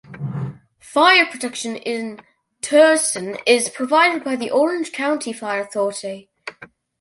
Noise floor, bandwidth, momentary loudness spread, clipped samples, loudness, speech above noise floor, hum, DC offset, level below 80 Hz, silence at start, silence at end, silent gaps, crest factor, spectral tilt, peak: -45 dBFS; 11.5 kHz; 19 LU; under 0.1%; -18 LUFS; 27 dB; none; under 0.1%; -64 dBFS; 0.1 s; 0.35 s; none; 18 dB; -3 dB/octave; -2 dBFS